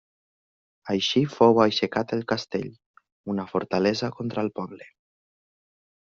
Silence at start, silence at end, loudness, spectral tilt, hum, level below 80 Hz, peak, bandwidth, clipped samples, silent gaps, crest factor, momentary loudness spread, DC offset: 0.85 s; 1.15 s; -24 LUFS; -4 dB/octave; none; -64 dBFS; -4 dBFS; 7.4 kHz; under 0.1%; 2.86-2.94 s, 3.12-3.24 s; 22 dB; 17 LU; under 0.1%